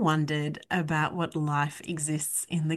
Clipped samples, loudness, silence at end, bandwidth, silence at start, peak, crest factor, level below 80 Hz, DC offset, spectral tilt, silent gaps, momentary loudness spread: under 0.1%; -29 LUFS; 0 s; 12.5 kHz; 0 s; -12 dBFS; 16 dB; -64 dBFS; under 0.1%; -4.5 dB/octave; none; 4 LU